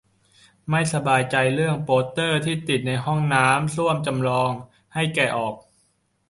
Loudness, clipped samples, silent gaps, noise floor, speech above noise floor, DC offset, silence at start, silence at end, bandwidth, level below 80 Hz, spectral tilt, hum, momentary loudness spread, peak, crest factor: -22 LUFS; under 0.1%; none; -67 dBFS; 45 dB; under 0.1%; 0.65 s; 0.7 s; 11.5 kHz; -56 dBFS; -5 dB/octave; none; 8 LU; -4 dBFS; 20 dB